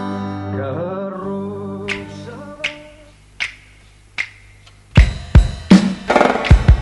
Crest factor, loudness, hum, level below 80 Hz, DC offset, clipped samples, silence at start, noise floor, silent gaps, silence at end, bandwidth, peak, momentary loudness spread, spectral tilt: 16 dB; -18 LUFS; none; -22 dBFS; under 0.1%; 0.3%; 0 s; -46 dBFS; none; 0 s; 11 kHz; 0 dBFS; 14 LU; -7 dB/octave